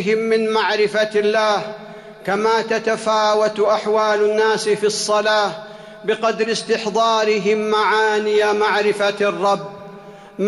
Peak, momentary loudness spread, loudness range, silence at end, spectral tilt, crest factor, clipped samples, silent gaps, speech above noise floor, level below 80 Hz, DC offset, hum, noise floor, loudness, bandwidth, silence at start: -6 dBFS; 12 LU; 1 LU; 0 s; -3.5 dB/octave; 12 dB; under 0.1%; none; 21 dB; -64 dBFS; under 0.1%; none; -39 dBFS; -18 LUFS; 12 kHz; 0 s